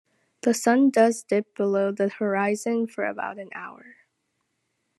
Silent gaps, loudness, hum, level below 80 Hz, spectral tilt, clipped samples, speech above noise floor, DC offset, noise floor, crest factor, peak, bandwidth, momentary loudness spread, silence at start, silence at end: none; -24 LUFS; none; -82 dBFS; -5 dB/octave; under 0.1%; 52 dB; under 0.1%; -76 dBFS; 18 dB; -6 dBFS; 12.5 kHz; 15 LU; 0.45 s; 1.25 s